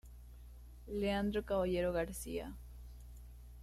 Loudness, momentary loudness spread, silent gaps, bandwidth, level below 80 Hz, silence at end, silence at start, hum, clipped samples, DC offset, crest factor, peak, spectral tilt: -38 LUFS; 21 LU; none; 15.5 kHz; -52 dBFS; 0 s; 0.05 s; 60 Hz at -50 dBFS; under 0.1%; under 0.1%; 16 dB; -24 dBFS; -5.5 dB/octave